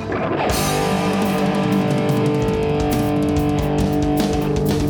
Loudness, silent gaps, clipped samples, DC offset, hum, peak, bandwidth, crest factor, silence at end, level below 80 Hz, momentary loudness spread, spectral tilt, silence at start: -19 LUFS; none; under 0.1%; under 0.1%; none; -6 dBFS; over 20 kHz; 12 dB; 0 s; -32 dBFS; 1 LU; -6 dB/octave; 0 s